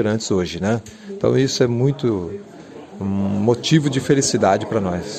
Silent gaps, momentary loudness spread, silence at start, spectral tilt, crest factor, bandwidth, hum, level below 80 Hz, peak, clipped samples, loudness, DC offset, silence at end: none; 16 LU; 0 s; -5.5 dB/octave; 16 dB; 14 kHz; none; -46 dBFS; -2 dBFS; under 0.1%; -19 LUFS; under 0.1%; 0 s